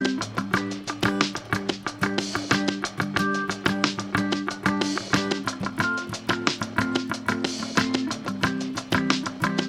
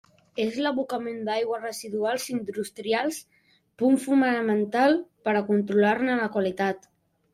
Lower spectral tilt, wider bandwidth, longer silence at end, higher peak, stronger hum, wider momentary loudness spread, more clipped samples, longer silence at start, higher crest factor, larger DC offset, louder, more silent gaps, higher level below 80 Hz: about the same, -4 dB/octave vs -5 dB/octave; about the same, 17 kHz vs 15.5 kHz; second, 0 s vs 0.55 s; first, -4 dBFS vs -10 dBFS; neither; second, 4 LU vs 10 LU; neither; second, 0 s vs 0.35 s; first, 22 dB vs 16 dB; neither; about the same, -26 LUFS vs -25 LUFS; neither; first, -54 dBFS vs -70 dBFS